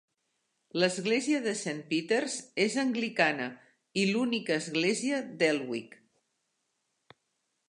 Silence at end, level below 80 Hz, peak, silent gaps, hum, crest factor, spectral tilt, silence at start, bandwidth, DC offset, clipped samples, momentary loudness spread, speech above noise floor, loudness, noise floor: 1.8 s; -82 dBFS; -10 dBFS; none; none; 22 dB; -4 dB/octave; 0.75 s; 11.5 kHz; under 0.1%; under 0.1%; 8 LU; 50 dB; -30 LUFS; -80 dBFS